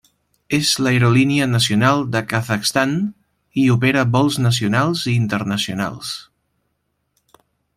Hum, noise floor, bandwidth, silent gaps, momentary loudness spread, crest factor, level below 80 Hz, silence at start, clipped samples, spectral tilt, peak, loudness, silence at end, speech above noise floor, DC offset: none; -71 dBFS; 15.5 kHz; none; 9 LU; 16 dB; -56 dBFS; 0.5 s; under 0.1%; -5 dB/octave; -2 dBFS; -18 LUFS; 1.55 s; 54 dB; under 0.1%